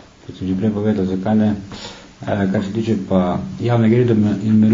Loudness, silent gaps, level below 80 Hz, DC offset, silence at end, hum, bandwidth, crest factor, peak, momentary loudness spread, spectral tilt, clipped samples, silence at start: -18 LUFS; none; -48 dBFS; under 0.1%; 0 s; none; 7.6 kHz; 16 dB; -2 dBFS; 16 LU; -8.5 dB/octave; under 0.1%; 0.3 s